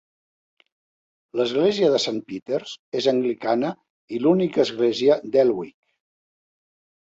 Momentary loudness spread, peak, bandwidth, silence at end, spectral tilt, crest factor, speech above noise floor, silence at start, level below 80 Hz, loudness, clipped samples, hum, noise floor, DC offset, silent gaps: 12 LU; -6 dBFS; 8 kHz; 1.3 s; -5.5 dB/octave; 18 dB; over 69 dB; 1.35 s; -68 dBFS; -22 LUFS; under 0.1%; none; under -90 dBFS; under 0.1%; 2.42-2.46 s, 2.79-2.92 s, 3.90-4.08 s